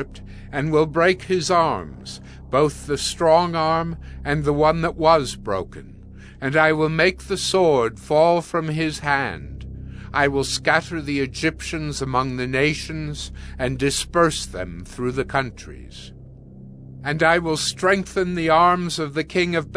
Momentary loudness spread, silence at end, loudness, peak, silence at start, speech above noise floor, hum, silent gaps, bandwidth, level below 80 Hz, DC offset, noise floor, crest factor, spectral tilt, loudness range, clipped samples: 17 LU; 0 s; -21 LUFS; -2 dBFS; 0 s; 20 dB; none; none; 11 kHz; -40 dBFS; under 0.1%; -41 dBFS; 20 dB; -4.5 dB/octave; 4 LU; under 0.1%